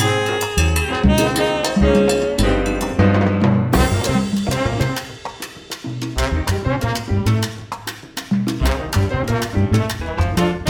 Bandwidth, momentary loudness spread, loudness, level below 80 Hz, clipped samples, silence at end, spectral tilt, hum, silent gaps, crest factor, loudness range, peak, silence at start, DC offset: 20 kHz; 13 LU; -18 LUFS; -26 dBFS; under 0.1%; 0 s; -5.5 dB/octave; none; none; 16 dB; 5 LU; -2 dBFS; 0 s; under 0.1%